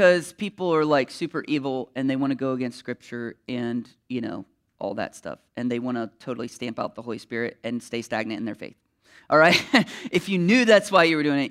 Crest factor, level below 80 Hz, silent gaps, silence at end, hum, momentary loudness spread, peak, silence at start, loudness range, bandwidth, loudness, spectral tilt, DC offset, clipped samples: 20 dB; -68 dBFS; none; 0 s; none; 17 LU; -4 dBFS; 0 s; 11 LU; 15 kHz; -24 LUFS; -5 dB/octave; under 0.1%; under 0.1%